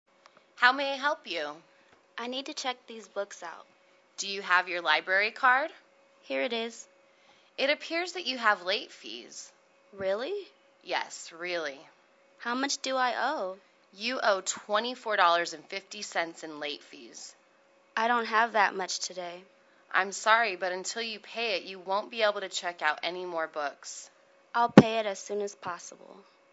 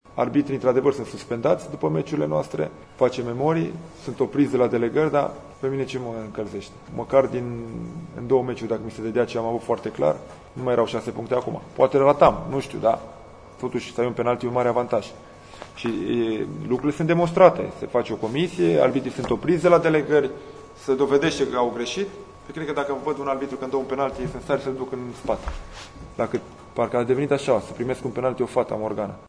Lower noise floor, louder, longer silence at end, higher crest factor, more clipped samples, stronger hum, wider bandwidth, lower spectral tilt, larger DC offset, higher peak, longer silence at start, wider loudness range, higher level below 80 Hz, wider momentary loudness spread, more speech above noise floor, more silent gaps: first, -63 dBFS vs -42 dBFS; second, -29 LUFS vs -23 LUFS; first, 0.3 s vs 0 s; first, 30 dB vs 22 dB; neither; neither; second, 8.2 kHz vs 10.5 kHz; second, -3.5 dB/octave vs -6.5 dB/octave; neither; about the same, 0 dBFS vs 0 dBFS; first, 0.6 s vs 0.1 s; about the same, 6 LU vs 6 LU; second, -74 dBFS vs -50 dBFS; first, 18 LU vs 14 LU; first, 34 dB vs 19 dB; neither